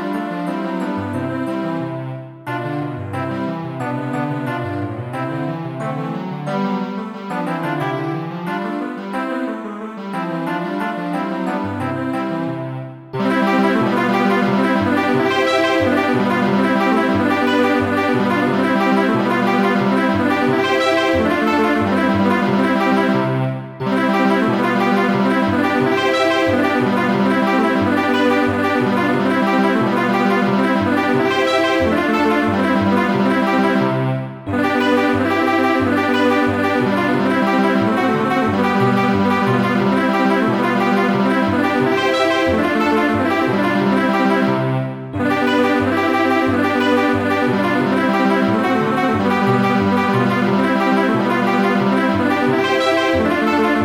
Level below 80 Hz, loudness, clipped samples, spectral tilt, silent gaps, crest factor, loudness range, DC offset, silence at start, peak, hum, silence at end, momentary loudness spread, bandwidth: -52 dBFS; -17 LUFS; under 0.1%; -6.5 dB/octave; none; 14 dB; 7 LU; under 0.1%; 0 s; -2 dBFS; none; 0 s; 8 LU; 16 kHz